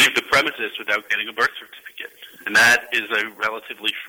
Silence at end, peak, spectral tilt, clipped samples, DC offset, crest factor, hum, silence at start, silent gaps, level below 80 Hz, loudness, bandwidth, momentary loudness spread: 0 s; -4 dBFS; -1 dB/octave; under 0.1%; under 0.1%; 16 dB; none; 0 s; none; -60 dBFS; -19 LUFS; over 20 kHz; 21 LU